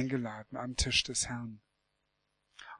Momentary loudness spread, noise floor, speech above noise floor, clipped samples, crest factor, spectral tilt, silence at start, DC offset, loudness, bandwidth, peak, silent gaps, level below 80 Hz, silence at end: 16 LU; -80 dBFS; 45 dB; under 0.1%; 22 dB; -2.5 dB/octave; 0 s; under 0.1%; -33 LUFS; 11.5 kHz; -14 dBFS; none; -50 dBFS; 0 s